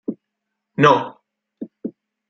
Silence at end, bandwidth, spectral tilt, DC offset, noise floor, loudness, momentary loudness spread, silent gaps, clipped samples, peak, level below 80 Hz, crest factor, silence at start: 0.4 s; 7.6 kHz; -6.5 dB/octave; under 0.1%; -79 dBFS; -16 LUFS; 22 LU; none; under 0.1%; -2 dBFS; -66 dBFS; 20 dB; 0.1 s